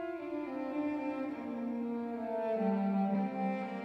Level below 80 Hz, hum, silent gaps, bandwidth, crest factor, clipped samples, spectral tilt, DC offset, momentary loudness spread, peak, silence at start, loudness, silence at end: -76 dBFS; none; none; 5.8 kHz; 14 dB; under 0.1%; -9.5 dB/octave; under 0.1%; 7 LU; -22 dBFS; 0 s; -36 LUFS; 0 s